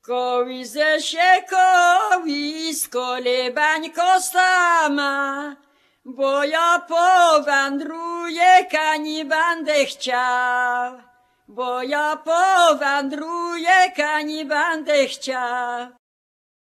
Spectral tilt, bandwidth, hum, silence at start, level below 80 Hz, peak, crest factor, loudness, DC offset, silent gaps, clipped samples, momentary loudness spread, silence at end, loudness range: 0 dB/octave; 14 kHz; none; 0.1 s; -78 dBFS; -2 dBFS; 18 dB; -19 LUFS; under 0.1%; none; under 0.1%; 12 LU; 0.75 s; 3 LU